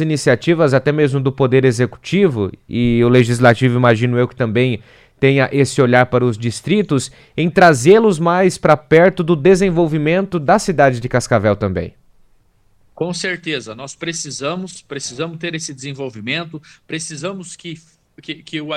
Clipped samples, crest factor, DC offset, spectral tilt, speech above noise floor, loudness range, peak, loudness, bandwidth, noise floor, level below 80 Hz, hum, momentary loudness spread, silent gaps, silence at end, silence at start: under 0.1%; 16 dB; under 0.1%; -6 dB/octave; 39 dB; 12 LU; 0 dBFS; -15 LUFS; 13.5 kHz; -54 dBFS; -46 dBFS; none; 15 LU; none; 0 s; 0 s